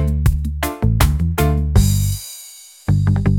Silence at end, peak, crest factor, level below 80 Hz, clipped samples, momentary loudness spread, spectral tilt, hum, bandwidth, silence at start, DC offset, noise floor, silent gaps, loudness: 0 s; -2 dBFS; 16 dB; -22 dBFS; under 0.1%; 12 LU; -6 dB/octave; none; 17 kHz; 0 s; under 0.1%; -39 dBFS; none; -18 LUFS